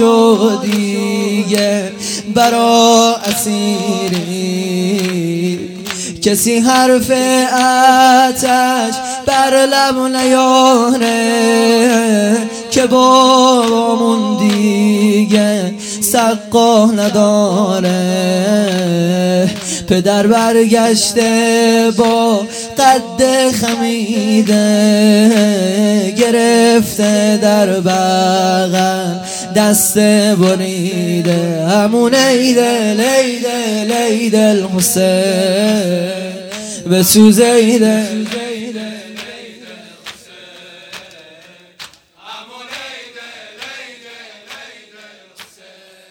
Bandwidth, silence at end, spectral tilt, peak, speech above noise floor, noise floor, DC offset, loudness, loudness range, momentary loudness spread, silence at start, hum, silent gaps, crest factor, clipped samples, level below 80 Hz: 18.5 kHz; 0.65 s; -4 dB/octave; 0 dBFS; 31 dB; -42 dBFS; under 0.1%; -11 LUFS; 14 LU; 14 LU; 0 s; none; none; 12 dB; under 0.1%; -52 dBFS